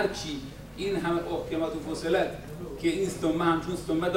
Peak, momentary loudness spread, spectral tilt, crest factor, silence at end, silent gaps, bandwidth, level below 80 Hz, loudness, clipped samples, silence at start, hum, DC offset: -12 dBFS; 10 LU; -5.5 dB/octave; 16 dB; 0 s; none; 16 kHz; -48 dBFS; -30 LUFS; under 0.1%; 0 s; none; under 0.1%